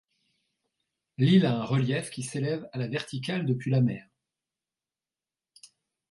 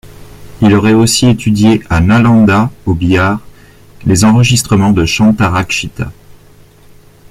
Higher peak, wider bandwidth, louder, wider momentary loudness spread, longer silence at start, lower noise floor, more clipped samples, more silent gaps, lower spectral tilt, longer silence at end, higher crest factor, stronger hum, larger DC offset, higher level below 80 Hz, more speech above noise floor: second, -10 dBFS vs 0 dBFS; second, 11.5 kHz vs 15.5 kHz; second, -27 LUFS vs -10 LUFS; about the same, 10 LU vs 8 LU; first, 1.2 s vs 0.05 s; first, under -90 dBFS vs -40 dBFS; neither; neither; about the same, -6.5 dB/octave vs -5.5 dB/octave; first, 2.1 s vs 1 s; first, 20 dB vs 10 dB; neither; neither; second, -68 dBFS vs -32 dBFS; first, over 64 dB vs 31 dB